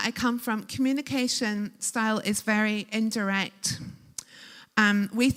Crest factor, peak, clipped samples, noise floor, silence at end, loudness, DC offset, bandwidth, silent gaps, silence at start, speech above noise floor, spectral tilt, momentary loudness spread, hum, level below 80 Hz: 22 dB; -6 dBFS; under 0.1%; -50 dBFS; 0 s; -27 LUFS; under 0.1%; 16.5 kHz; none; 0 s; 23 dB; -3.5 dB/octave; 16 LU; none; -62 dBFS